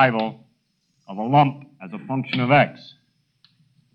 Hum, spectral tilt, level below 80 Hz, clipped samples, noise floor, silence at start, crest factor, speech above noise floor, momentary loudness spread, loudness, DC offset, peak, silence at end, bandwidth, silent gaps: none; -8.5 dB/octave; -66 dBFS; under 0.1%; -69 dBFS; 0 s; 18 dB; 48 dB; 20 LU; -21 LUFS; under 0.1%; -4 dBFS; 1.2 s; 5.6 kHz; none